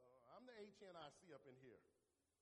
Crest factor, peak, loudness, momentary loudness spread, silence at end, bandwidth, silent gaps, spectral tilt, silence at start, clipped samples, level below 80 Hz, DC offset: 18 dB; -46 dBFS; -64 LUFS; 7 LU; 0.35 s; 10.5 kHz; none; -4.5 dB/octave; 0 s; under 0.1%; under -90 dBFS; under 0.1%